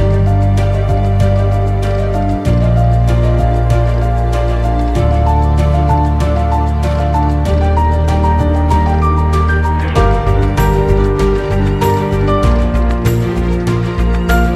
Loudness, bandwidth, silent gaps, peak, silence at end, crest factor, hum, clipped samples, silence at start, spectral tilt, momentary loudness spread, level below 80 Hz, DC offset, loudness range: -13 LUFS; 13.5 kHz; none; 0 dBFS; 0 s; 10 dB; none; under 0.1%; 0 s; -8 dB/octave; 3 LU; -16 dBFS; under 0.1%; 1 LU